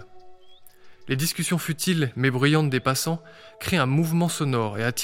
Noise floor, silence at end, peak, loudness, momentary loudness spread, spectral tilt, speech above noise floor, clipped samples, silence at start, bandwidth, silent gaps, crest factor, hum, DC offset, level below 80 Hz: -46 dBFS; 0 s; -6 dBFS; -24 LUFS; 6 LU; -5 dB/octave; 23 dB; under 0.1%; 0 s; 17 kHz; none; 20 dB; none; under 0.1%; -56 dBFS